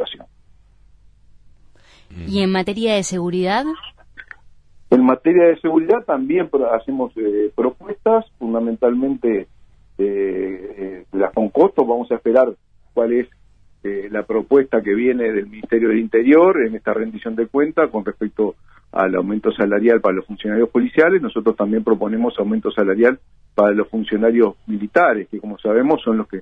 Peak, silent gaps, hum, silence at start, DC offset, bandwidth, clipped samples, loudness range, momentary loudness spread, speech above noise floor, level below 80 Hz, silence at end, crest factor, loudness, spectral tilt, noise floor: -2 dBFS; none; none; 0 s; under 0.1%; 10.5 kHz; under 0.1%; 4 LU; 10 LU; 33 dB; -52 dBFS; 0 s; 16 dB; -18 LUFS; -6 dB/octave; -50 dBFS